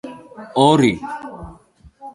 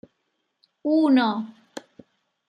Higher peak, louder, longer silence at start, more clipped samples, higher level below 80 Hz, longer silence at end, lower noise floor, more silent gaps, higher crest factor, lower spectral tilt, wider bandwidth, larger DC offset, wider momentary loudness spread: first, 0 dBFS vs -8 dBFS; first, -16 LUFS vs -22 LUFS; second, 0.05 s vs 0.85 s; neither; first, -48 dBFS vs -80 dBFS; second, 0.05 s vs 0.7 s; second, -48 dBFS vs -75 dBFS; neither; about the same, 20 dB vs 18 dB; about the same, -6 dB/octave vs -6 dB/octave; first, 11.5 kHz vs 9.6 kHz; neither; about the same, 24 LU vs 23 LU